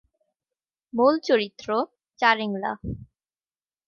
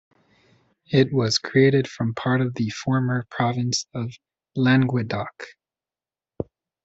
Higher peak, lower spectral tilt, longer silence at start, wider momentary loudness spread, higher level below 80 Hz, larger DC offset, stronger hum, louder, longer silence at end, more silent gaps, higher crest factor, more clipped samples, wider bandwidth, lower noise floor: about the same, -6 dBFS vs -6 dBFS; about the same, -5.5 dB/octave vs -5.5 dB/octave; about the same, 0.95 s vs 0.9 s; second, 13 LU vs 17 LU; about the same, -54 dBFS vs -58 dBFS; neither; neither; about the same, -24 LUFS vs -22 LUFS; first, 0.85 s vs 0.4 s; neither; about the same, 20 dB vs 18 dB; neither; second, 7 kHz vs 8 kHz; about the same, under -90 dBFS vs under -90 dBFS